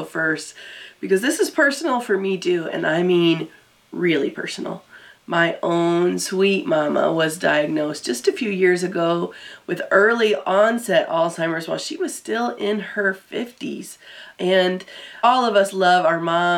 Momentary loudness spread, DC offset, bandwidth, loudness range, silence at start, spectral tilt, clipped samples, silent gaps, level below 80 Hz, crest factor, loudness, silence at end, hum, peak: 13 LU; under 0.1%; 16.5 kHz; 4 LU; 0 s; -4.5 dB/octave; under 0.1%; none; -74 dBFS; 18 dB; -20 LUFS; 0 s; none; -2 dBFS